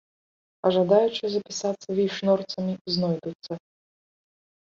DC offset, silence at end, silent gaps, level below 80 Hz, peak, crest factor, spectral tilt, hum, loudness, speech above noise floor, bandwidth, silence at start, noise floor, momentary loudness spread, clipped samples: under 0.1%; 1.1 s; 2.81-2.85 s, 3.35-3.39 s; -68 dBFS; -6 dBFS; 20 dB; -5.5 dB/octave; none; -25 LUFS; over 65 dB; 7.6 kHz; 0.65 s; under -90 dBFS; 14 LU; under 0.1%